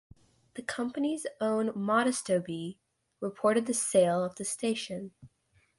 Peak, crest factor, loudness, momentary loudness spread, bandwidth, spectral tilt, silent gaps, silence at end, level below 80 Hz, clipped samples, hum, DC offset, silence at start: -12 dBFS; 18 dB; -30 LUFS; 14 LU; 11.5 kHz; -4 dB/octave; none; 0.5 s; -72 dBFS; under 0.1%; none; under 0.1%; 0.55 s